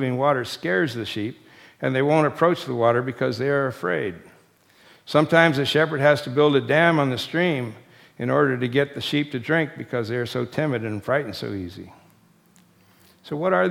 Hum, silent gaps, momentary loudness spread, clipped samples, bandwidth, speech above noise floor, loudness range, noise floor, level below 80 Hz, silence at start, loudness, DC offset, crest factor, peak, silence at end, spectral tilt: none; none; 12 LU; under 0.1%; 16 kHz; 35 dB; 8 LU; -57 dBFS; -64 dBFS; 0 s; -22 LUFS; under 0.1%; 22 dB; 0 dBFS; 0 s; -6.5 dB/octave